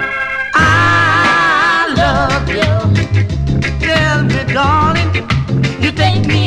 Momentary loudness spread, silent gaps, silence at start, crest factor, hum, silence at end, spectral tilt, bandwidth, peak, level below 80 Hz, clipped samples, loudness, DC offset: 6 LU; none; 0 s; 12 dB; none; 0 s; -5.5 dB/octave; 10.5 kHz; 0 dBFS; -26 dBFS; under 0.1%; -12 LUFS; under 0.1%